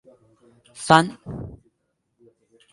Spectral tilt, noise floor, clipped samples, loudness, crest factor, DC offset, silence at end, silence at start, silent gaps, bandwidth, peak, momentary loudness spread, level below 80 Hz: -4.5 dB/octave; -74 dBFS; under 0.1%; -18 LUFS; 26 dB; under 0.1%; 1.2 s; 0.75 s; none; 11.5 kHz; 0 dBFS; 20 LU; -54 dBFS